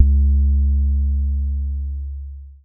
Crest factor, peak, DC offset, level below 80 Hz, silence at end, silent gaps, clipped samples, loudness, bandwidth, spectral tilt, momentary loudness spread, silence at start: 16 dB; 0 dBFS; under 0.1%; -18 dBFS; 0.1 s; none; under 0.1%; -20 LUFS; 0.6 kHz; -22 dB/octave; 14 LU; 0 s